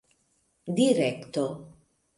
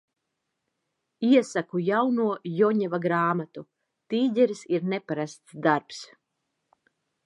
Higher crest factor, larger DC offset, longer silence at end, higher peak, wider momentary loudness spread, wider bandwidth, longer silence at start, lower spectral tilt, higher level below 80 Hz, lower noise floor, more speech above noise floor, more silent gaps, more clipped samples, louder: about the same, 20 dB vs 20 dB; neither; second, 0.5 s vs 1.2 s; second, -10 dBFS vs -6 dBFS; first, 18 LU vs 11 LU; about the same, 11.5 kHz vs 11 kHz; second, 0.65 s vs 1.2 s; about the same, -5.5 dB/octave vs -6.5 dB/octave; first, -68 dBFS vs -80 dBFS; second, -71 dBFS vs -81 dBFS; second, 45 dB vs 56 dB; neither; neither; about the same, -27 LUFS vs -25 LUFS